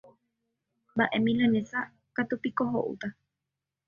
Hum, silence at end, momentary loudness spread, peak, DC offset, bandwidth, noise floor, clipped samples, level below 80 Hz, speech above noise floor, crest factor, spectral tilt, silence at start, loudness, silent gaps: none; 0.75 s; 11 LU; -10 dBFS; under 0.1%; 7 kHz; -87 dBFS; under 0.1%; -66 dBFS; 59 dB; 20 dB; -7 dB/octave; 0.95 s; -29 LUFS; none